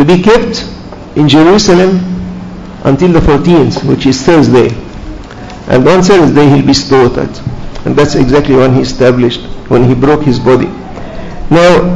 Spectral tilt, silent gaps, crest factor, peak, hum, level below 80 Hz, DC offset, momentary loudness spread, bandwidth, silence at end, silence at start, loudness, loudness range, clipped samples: -6 dB/octave; none; 8 dB; 0 dBFS; none; -24 dBFS; 0.6%; 19 LU; 10 kHz; 0 s; 0 s; -7 LUFS; 2 LU; 5%